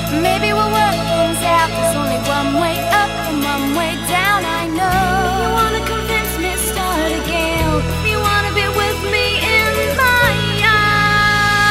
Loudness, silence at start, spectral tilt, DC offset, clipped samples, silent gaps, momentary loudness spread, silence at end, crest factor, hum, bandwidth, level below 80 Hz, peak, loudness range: -15 LUFS; 0 s; -4 dB/octave; under 0.1%; under 0.1%; none; 6 LU; 0 s; 16 dB; none; 16 kHz; -30 dBFS; 0 dBFS; 3 LU